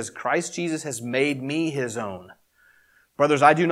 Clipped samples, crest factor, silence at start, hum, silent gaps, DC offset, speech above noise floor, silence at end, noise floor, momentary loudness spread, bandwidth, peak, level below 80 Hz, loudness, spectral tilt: under 0.1%; 22 dB; 0 s; none; none; under 0.1%; 37 dB; 0 s; -60 dBFS; 16 LU; 15.5 kHz; -2 dBFS; -72 dBFS; -24 LUFS; -4.5 dB/octave